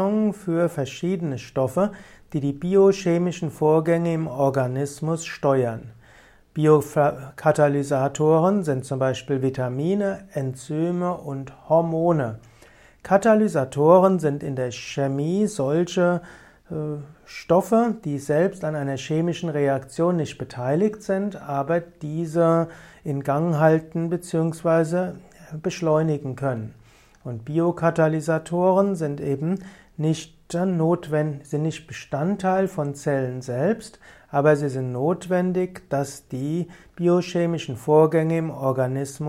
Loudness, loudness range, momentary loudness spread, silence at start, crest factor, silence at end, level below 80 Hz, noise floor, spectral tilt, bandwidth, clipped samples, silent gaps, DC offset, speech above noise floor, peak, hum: -23 LUFS; 4 LU; 11 LU; 0 s; 20 dB; 0 s; -58 dBFS; -52 dBFS; -7 dB/octave; 15 kHz; under 0.1%; none; under 0.1%; 30 dB; -2 dBFS; none